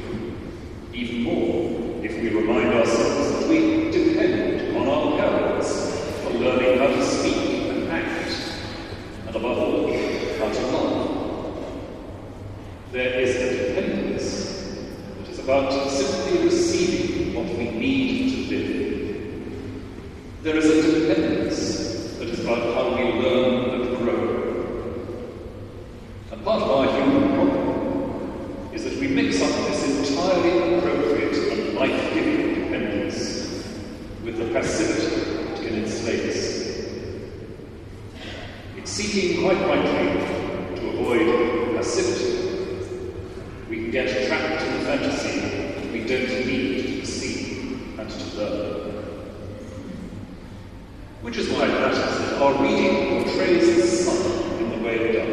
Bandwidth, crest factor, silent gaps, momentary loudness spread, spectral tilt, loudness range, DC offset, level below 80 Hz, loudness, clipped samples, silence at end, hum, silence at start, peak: 12 kHz; 18 dB; none; 16 LU; -5 dB/octave; 6 LU; under 0.1%; -44 dBFS; -23 LUFS; under 0.1%; 0 s; none; 0 s; -6 dBFS